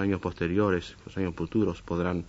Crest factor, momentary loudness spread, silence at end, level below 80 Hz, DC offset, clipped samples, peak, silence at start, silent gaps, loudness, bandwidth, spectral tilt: 16 dB; 7 LU; 0 s; -50 dBFS; under 0.1%; under 0.1%; -12 dBFS; 0 s; none; -29 LUFS; 8 kHz; -7.5 dB/octave